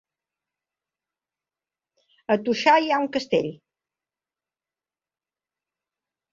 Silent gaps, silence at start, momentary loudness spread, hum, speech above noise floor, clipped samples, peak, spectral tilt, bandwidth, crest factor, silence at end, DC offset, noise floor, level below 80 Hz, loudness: none; 2.3 s; 11 LU; none; over 68 dB; under 0.1%; -6 dBFS; -4.5 dB/octave; 7.6 kHz; 22 dB; 2.75 s; under 0.1%; under -90 dBFS; -70 dBFS; -22 LUFS